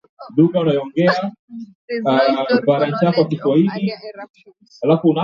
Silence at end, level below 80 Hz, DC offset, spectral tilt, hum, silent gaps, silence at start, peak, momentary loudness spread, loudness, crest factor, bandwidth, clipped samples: 0 s; -64 dBFS; under 0.1%; -8.5 dB/octave; none; 1.39-1.48 s, 1.75-1.88 s, 4.30-4.34 s; 0.2 s; -2 dBFS; 18 LU; -17 LUFS; 16 dB; 7 kHz; under 0.1%